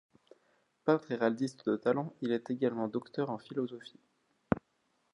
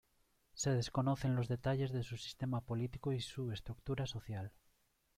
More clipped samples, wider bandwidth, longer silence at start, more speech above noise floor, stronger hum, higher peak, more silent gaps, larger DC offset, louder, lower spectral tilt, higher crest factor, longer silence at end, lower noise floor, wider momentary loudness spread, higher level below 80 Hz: neither; second, 10.5 kHz vs 13.5 kHz; first, 0.85 s vs 0.55 s; first, 43 dB vs 38 dB; neither; first, -10 dBFS vs -24 dBFS; neither; neither; first, -34 LUFS vs -40 LUFS; first, -7.5 dB/octave vs -6 dB/octave; first, 26 dB vs 16 dB; second, 0.55 s vs 0.7 s; about the same, -76 dBFS vs -76 dBFS; second, 7 LU vs 10 LU; second, -66 dBFS vs -60 dBFS